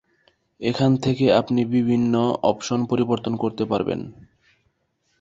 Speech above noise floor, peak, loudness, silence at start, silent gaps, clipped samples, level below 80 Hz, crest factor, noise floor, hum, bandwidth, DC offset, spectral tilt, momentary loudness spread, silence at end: 49 dB; -4 dBFS; -22 LUFS; 0.6 s; none; under 0.1%; -56 dBFS; 18 dB; -70 dBFS; none; 7.8 kHz; under 0.1%; -7 dB/octave; 8 LU; 1.1 s